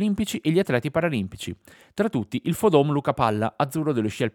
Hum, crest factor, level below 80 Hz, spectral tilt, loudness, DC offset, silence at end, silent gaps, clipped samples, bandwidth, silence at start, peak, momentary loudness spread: none; 20 dB; -56 dBFS; -6.5 dB/octave; -24 LUFS; under 0.1%; 0.05 s; none; under 0.1%; 19.5 kHz; 0 s; -4 dBFS; 13 LU